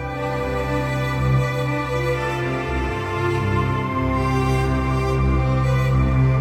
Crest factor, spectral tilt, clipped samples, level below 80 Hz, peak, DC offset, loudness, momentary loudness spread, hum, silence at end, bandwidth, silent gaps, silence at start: 12 dB; -7.5 dB/octave; under 0.1%; -28 dBFS; -8 dBFS; under 0.1%; -21 LUFS; 5 LU; none; 0 s; 13 kHz; none; 0 s